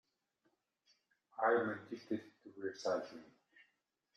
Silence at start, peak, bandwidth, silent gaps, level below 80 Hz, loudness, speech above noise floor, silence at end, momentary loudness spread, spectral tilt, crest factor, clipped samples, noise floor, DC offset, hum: 1.35 s; -22 dBFS; 8.6 kHz; none; -88 dBFS; -39 LUFS; 44 dB; 0.9 s; 20 LU; -5 dB/octave; 22 dB; under 0.1%; -83 dBFS; under 0.1%; none